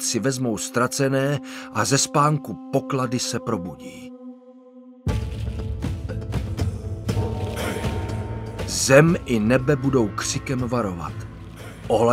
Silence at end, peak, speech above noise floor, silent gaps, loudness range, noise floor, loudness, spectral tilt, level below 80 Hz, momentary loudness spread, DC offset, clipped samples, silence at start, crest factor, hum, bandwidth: 0 s; -2 dBFS; 24 dB; none; 9 LU; -46 dBFS; -23 LUFS; -5 dB/octave; -38 dBFS; 15 LU; under 0.1%; under 0.1%; 0 s; 20 dB; none; 16 kHz